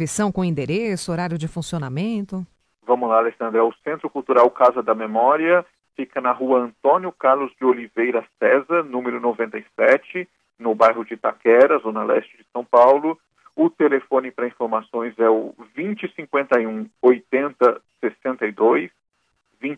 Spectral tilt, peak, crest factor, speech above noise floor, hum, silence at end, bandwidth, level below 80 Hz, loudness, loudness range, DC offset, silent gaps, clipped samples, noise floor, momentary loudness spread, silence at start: -6 dB/octave; -2 dBFS; 18 dB; 49 dB; none; 0 s; 11 kHz; -60 dBFS; -20 LUFS; 4 LU; under 0.1%; none; under 0.1%; -69 dBFS; 12 LU; 0 s